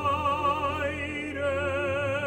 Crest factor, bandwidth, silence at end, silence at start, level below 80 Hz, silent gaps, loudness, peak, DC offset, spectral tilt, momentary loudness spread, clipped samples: 14 dB; 16 kHz; 0 s; 0 s; -50 dBFS; none; -28 LUFS; -14 dBFS; under 0.1%; -5.5 dB/octave; 5 LU; under 0.1%